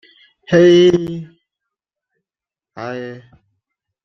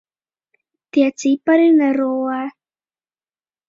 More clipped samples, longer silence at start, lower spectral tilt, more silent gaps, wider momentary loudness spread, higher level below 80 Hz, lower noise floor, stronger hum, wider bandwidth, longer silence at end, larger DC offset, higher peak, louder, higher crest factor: neither; second, 0.5 s vs 0.95 s; first, -6.5 dB/octave vs -4 dB/octave; neither; first, 21 LU vs 11 LU; first, -54 dBFS vs -70 dBFS; about the same, -90 dBFS vs under -90 dBFS; neither; about the same, 7 kHz vs 7.6 kHz; second, 0.85 s vs 1.2 s; neither; about the same, -2 dBFS vs -4 dBFS; first, -12 LUFS vs -16 LUFS; about the same, 16 dB vs 16 dB